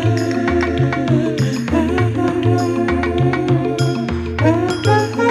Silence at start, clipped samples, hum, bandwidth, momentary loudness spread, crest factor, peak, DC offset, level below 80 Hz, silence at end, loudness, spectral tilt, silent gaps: 0 s; under 0.1%; none; 12 kHz; 3 LU; 14 dB; -2 dBFS; under 0.1%; -34 dBFS; 0 s; -17 LUFS; -7 dB/octave; none